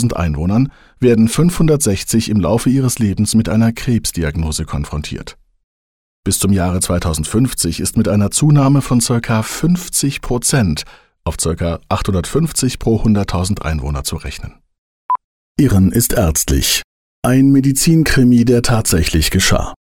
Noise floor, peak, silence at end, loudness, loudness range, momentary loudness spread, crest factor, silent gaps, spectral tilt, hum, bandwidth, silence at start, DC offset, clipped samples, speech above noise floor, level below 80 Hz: under -90 dBFS; -2 dBFS; 0.25 s; -15 LUFS; 6 LU; 10 LU; 12 dB; 5.64-6.23 s, 14.78-15.09 s, 15.24-15.55 s, 16.84-17.22 s; -5 dB/octave; none; 18 kHz; 0 s; 0.3%; under 0.1%; over 76 dB; -28 dBFS